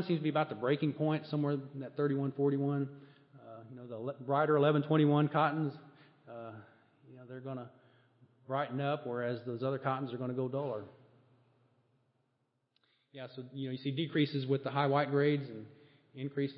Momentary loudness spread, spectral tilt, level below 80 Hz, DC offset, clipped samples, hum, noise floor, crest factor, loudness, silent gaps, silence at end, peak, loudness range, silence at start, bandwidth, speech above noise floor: 20 LU; -10.5 dB/octave; -86 dBFS; under 0.1%; under 0.1%; none; -80 dBFS; 20 dB; -34 LUFS; none; 0 s; -14 dBFS; 11 LU; 0 s; 5.4 kHz; 46 dB